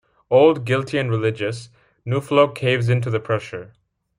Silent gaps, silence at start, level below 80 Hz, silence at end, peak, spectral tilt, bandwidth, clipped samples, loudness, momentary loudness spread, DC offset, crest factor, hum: none; 0.3 s; -60 dBFS; 0.55 s; -2 dBFS; -7 dB/octave; 11 kHz; under 0.1%; -20 LUFS; 16 LU; under 0.1%; 18 dB; none